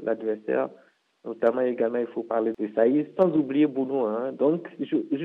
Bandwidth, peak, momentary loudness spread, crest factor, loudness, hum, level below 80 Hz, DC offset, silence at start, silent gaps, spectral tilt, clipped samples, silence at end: 4.1 kHz; -8 dBFS; 7 LU; 16 dB; -26 LUFS; none; -76 dBFS; under 0.1%; 0 s; none; -9.5 dB/octave; under 0.1%; 0 s